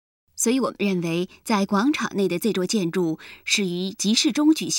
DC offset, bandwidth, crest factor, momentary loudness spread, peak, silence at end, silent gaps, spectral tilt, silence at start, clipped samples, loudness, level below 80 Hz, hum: under 0.1%; 17 kHz; 18 dB; 7 LU; -6 dBFS; 0 s; none; -4 dB/octave; 0.35 s; under 0.1%; -23 LUFS; -64 dBFS; none